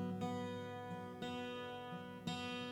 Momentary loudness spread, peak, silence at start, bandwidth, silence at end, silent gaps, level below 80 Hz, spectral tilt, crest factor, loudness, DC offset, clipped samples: 5 LU; -28 dBFS; 0 s; 18 kHz; 0 s; none; -76 dBFS; -5.5 dB/octave; 16 dB; -46 LUFS; under 0.1%; under 0.1%